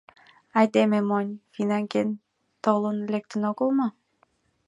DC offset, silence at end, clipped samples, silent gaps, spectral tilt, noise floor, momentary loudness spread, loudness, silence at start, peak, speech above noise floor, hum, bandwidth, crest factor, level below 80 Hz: under 0.1%; 0.75 s; under 0.1%; none; -7 dB/octave; -67 dBFS; 9 LU; -25 LUFS; 0.55 s; -6 dBFS; 43 dB; none; 10.5 kHz; 20 dB; -76 dBFS